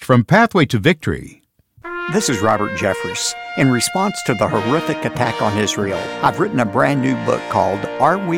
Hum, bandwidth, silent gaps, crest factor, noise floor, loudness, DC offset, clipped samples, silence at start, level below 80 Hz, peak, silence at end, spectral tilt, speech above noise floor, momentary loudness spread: none; 17 kHz; none; 16 dB; -37 dBFS; -17 LUFS; under 0.1%; under 0.1%; 0 s; -48 dBFS; -2 dBFS; 0 s; -5 dB/octave; 20 dB; 7 LU